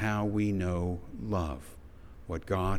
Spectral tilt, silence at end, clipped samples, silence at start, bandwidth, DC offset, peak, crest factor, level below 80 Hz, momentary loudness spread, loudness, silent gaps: -7.5 dB/octave; 0 s; under 0.1%; 0 s; 14 kHz; under 0.1%; -16 dBFS; 16 dB; -44 dBFS; 21 LU; -33 LUFS; none